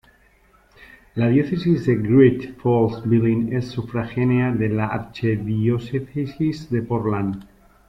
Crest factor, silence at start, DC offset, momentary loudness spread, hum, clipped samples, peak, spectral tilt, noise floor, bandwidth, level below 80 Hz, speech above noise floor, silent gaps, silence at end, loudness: 18 dB; 1.15 s; under 0.1%; 9 LU; none; under 0.1%; -4 dBFS; -9.5 dB/octave; -56 dBFS; 7.6 kHz; -50 dBFS; 36 dB; none; 0.45 s; -21 LUFS